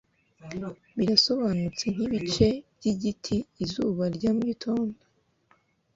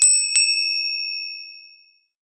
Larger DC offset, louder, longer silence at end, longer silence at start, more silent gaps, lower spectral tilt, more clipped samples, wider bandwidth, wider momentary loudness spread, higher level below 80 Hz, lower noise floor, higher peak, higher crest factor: neither; second, -27 LUFS vs -18 LUFS; first, 1 s vs 0.55 s; first, 0.4 s vs 0 s; neither; first, -5.5 dB/octave vs 8 dB/octave; neither; second, 7.8 kHz vs 10.5 kHz; second, 13 LU vs 19 LU; first, -52 dBFS vs -74 dBFS; first, -66 dBFS vs -55 dBFS; second, -8 dBFS vs -2 dBFS; about the same, 20 dB vs 20 dB